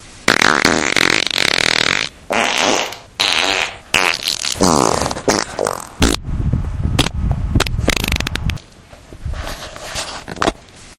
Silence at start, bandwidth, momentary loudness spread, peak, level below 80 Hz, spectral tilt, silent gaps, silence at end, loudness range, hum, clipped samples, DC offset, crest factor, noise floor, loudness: 0 s; 17.5 kHz; 12 LU; 0 dBFS; -28 dBFS; -3 dB/octave; none; 0.05 s; 7 LU; none; under 0.1%; under 0.1%; 18 dB; -41 dBFS; -16 LUFS